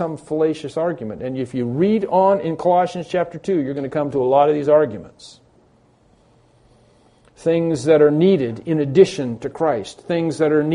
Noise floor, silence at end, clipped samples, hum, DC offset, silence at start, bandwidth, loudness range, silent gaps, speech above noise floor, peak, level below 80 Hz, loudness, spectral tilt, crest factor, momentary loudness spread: -55 dBFS; 0 s; under 0.1%; none; under 0.1%; 0 s; 10.5 kHz; 4 LU; none; 37 dB; 0 dBFS; -58 dBFS; -19 LUFS; -7 dB/octave; 18 dB; 10 LU